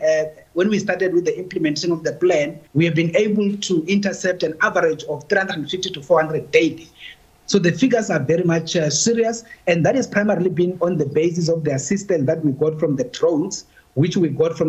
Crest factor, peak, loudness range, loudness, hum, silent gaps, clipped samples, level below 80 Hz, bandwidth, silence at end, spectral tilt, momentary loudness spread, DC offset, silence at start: 20 dB; 0 dBFS; 2 LU; -19 LUFS; none; none; under 0.1%; -58 dBFS; 8.6 kHz; 0 s; -5 dB/octave; 6 LU; under 0.1%; 0 s